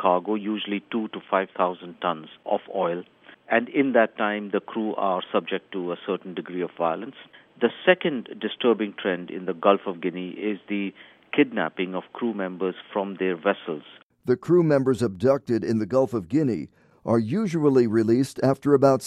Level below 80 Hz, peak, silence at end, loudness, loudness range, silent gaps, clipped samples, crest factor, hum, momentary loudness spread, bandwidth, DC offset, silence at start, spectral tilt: -66 dBFS; -4 dBFS; 0 s; -25 LUFS; 4 LU; 14.03-14.10 s; under 0.1%; 22 dB; none; 10 LU; 12.5 kHz; under 0.1%; 0 s; -7 dB/octave